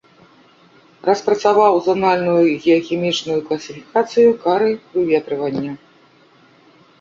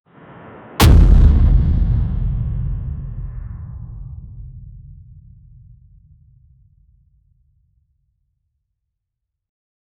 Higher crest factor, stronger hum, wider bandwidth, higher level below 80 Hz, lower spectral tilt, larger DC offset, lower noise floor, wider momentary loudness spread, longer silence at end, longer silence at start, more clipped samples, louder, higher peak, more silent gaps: about the same, 16 dB vs 16 dB; neither; second, 7.6 kHz vs 18 kHz; second, -60 dBFS vs -20 dBFS; about the same, -5.5 dB/octave vs -6.5 dB/octave; neither; second, -51 dBFS vs -79 dBFS; second, 10 LU vs 26 LU; second, 1.25 s vs 5.2 s; first, 1.05 s vs 0.8 s; neither; about the same, -17 LUFS vs -16 LUFS; about the same, -2 dBFS vs -2 dBFS; neither